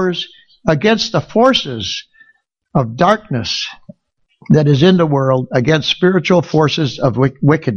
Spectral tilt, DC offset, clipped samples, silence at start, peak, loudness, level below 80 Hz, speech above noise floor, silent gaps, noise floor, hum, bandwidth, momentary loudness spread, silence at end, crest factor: -6 dB/octave; under 0.1%; under 0.1%; 0 s; 0 dBFS; -14 LUFS; -46 dBFS; 49 dB; none; -62 dBFS; none; 7.2 kHz; 10 LU; 0 s; 14 dB